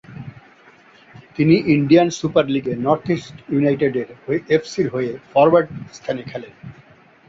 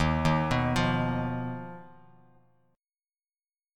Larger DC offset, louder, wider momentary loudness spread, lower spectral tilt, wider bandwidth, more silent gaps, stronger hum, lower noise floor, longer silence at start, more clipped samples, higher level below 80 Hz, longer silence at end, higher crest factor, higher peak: neither; first, -18 LUFS vs -28 LUFS; first, 19 LU vs 16 LU; about the same, -6.5 dB/octave vs -6.5 dB/octave; second, 7.8 kHz vs 13 kHz; neither; neither; second, -49 dBFS vs under -90 dBFS; about the same, 0.1 s vs 0 s; neither; second, -56 dBFS vs -44 dBFS; second, 0.55 s vs 1.85 s; about the same, 18 dB vs 18 dB; first, -2 dBFS vs -12 dBFS